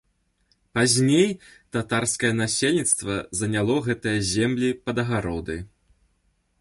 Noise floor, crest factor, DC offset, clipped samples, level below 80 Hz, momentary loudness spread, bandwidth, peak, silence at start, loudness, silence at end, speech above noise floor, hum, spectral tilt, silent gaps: -68 dBFS; 18 dB; under 0.1%; under 0.1%; -50 dBFS; 11 LU; 12 kHz; -6 dBFS; 0.75 s; -23 LUFS; 0.95 s; 45 dB; none; -4 dB/octave; none